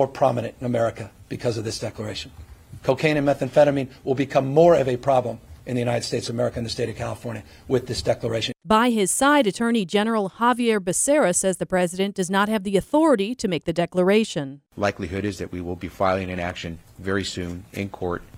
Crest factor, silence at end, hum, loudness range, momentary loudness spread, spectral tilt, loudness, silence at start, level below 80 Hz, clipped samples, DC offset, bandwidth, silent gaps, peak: 18 dB; 0 s; none; 6 LU; 13 LU; -4.5 dB/octave; -22 LUFS; 0 s; -50 dBFS; under 0.1%; under 0.1%; 16 kHz; none; -4 dBFS